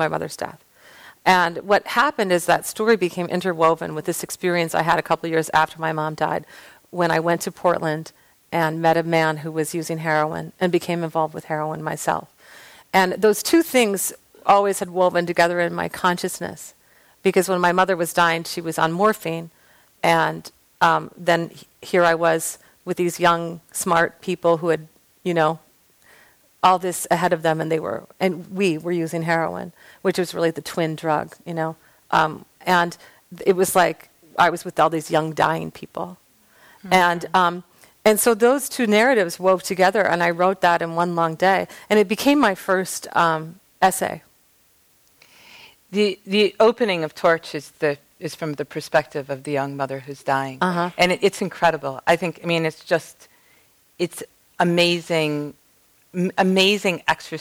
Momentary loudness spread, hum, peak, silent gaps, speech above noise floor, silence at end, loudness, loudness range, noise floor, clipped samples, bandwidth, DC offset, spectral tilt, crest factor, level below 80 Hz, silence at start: 11 LU; none; -4 dBFS; none; 38 dB; 0 s; -21 LUFS; 5 LU; -59 dBFS; under 0.1%; over 20 kHz; under 0.1%; -4.5 dB/octave; 16 dB; -60 dBFS; 0 s